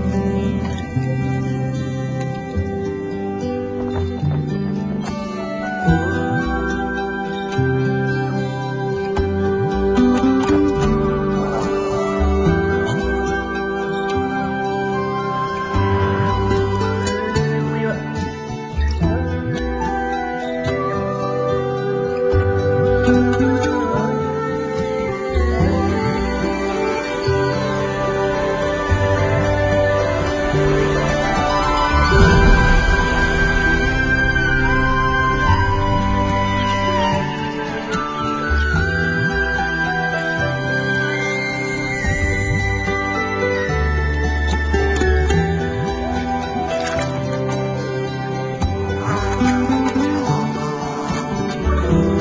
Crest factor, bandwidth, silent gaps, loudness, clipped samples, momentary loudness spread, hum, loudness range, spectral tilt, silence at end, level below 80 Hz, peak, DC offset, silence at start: 18 dB; 8 kHz; none; -19 LUFS; under 0.1%; 7 LU; none; 6 LU; -6.5 dB/octave; 0 s; -26 dBFS; 0 dBFS; under 0.1%; 0 s